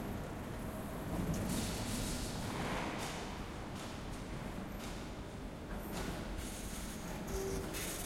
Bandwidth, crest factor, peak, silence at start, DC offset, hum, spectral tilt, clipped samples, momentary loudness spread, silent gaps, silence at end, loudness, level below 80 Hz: 16.5 kHz; 16 dB; -26 dBFS; 0 s; under 0.1%; none; -4.5 dB/octave; under 0.1%; 7 LU; none; 0 s; -42 LUFS; -48 dBFS